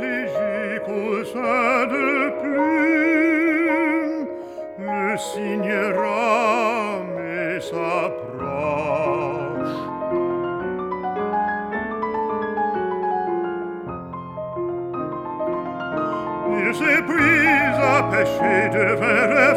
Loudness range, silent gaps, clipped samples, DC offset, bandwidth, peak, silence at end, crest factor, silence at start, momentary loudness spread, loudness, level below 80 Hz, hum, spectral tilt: 7 LU; none; under 0.1%; under 0.1%; 14.5 kHz; -4 dBFS; 0 s; 18 dB; 0 s; 10 LU; -21 LUFS; -54 dBFS; none; -6 dB/octave